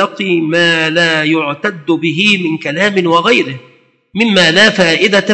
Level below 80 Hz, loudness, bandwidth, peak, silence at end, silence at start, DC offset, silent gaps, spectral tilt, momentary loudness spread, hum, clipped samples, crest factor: -58 dBFS; -11 LUFS; 11 kHz; 0 dBFS; 0 s; 0 s; under 0.1%; none; -4 dB/octave; 9 LU; none; 0.2%; 12 dB